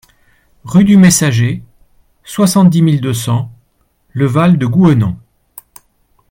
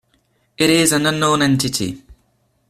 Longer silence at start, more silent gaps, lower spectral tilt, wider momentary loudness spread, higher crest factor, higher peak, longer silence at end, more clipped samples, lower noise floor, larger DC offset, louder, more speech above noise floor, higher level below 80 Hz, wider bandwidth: about the same, 0.65 s vs 0.6 s; neither; first, -6 dB/octave vs -3.5 dB/octave; first, 18 LU vs 11 LU; second, 12 dB vs 18 dB; about the same, 0 dBFS vs -2 dBFS; first, 1.15 s vs 0.55 s; neither; second, -58 dBFS vs -62 dBFS; neither; first, -11 LUFS vs -16 LUFS; about the same, 48 dB vs 46 dB; about the same, -46 dBFS vs -50 dBFS; about the same, 17 kHz vs 16 kHz